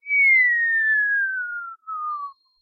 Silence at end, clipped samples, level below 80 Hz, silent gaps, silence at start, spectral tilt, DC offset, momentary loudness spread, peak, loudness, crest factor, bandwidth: 0.3 s; under 0.1%; -84 dBFS; none; 0.05 s; 3.5 dB/octave; under 0.1%; 18 LU; -10 dBFS; -18 LUFS; 12 dB; 4.7 kHz